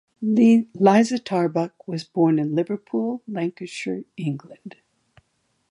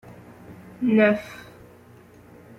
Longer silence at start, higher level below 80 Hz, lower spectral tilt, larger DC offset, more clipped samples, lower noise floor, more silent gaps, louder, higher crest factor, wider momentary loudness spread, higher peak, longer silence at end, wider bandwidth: second, 0.2 s vs 0.5 s; second, -72 dBFS vs -62 dBFS; about the same, -7 dB/octave vs -7.5 dB/octave; neither; neither; first, -70 dBFS vs -50 dBFS; neither; about the same, -22 LUFS vs -21 LUFS; about the same, 20 dB vs 20 dB; second, 14 LU vs 26 LU; first, -4 dBFS vs -8 dBFS; second, 1 s vs 1.2 s; second, 11 kHz vs 13.5 kHz